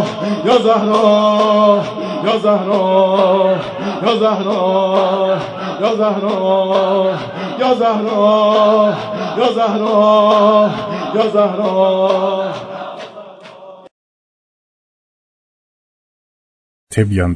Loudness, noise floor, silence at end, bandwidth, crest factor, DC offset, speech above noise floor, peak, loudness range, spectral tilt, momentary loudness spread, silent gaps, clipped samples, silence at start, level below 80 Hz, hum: -14 LUFS; -36 dBFS; 0 s; 11 kHz; 14 dB; under 0.1%; 23 dB; 0 dBFS; 8 LU; -6.5 dB/octave; 10 LU; 13.91-16.87 s; under 0.1%; 0 s; -50 dBFS; none